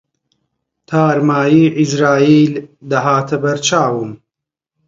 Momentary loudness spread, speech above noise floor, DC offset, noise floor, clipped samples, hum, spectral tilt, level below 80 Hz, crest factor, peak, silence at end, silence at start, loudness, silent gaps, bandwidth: 9 LU; 70 dB; under 0.1%; -83 dBFS; under 0.1%; none; -5.5 dB/octave; -58 dBFS; 14 dB; 0 dBFS; 0.7 s; 0.9 s; -13 LUFS; none; 7.8 kHz